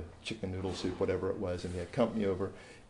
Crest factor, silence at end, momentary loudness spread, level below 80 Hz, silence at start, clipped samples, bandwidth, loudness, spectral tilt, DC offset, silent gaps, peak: 18 dB; 0.05 s; 8 LU; -60 dBFS; 0 s; under 0.1%; 11 kHz; -35 LUFS; -6.5 dB/octave; under 0.1%; none; -16 dBFS